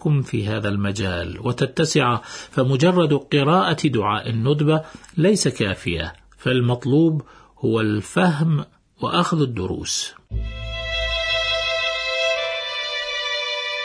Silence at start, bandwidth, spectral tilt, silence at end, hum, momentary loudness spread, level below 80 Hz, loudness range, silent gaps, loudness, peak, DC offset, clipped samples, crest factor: 0 s; 10.5 kHz; -5 dB/octave; 0 s; none; 10 LU; -40 dBFS; 3 LU; none; -21 LUFS; -4 dBFS; under 0.1%; under 0.1%; 16 dB